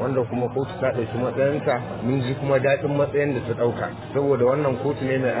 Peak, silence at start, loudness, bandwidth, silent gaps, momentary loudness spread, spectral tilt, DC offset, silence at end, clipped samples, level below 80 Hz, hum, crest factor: -8 dBFS; 0 s; -23 LUFS; 4 kHz; none; 5 LU; -11.5 dB/octave; under 0.1%; 0 s; under 0.1%; -50 dBFS; none; 14 dB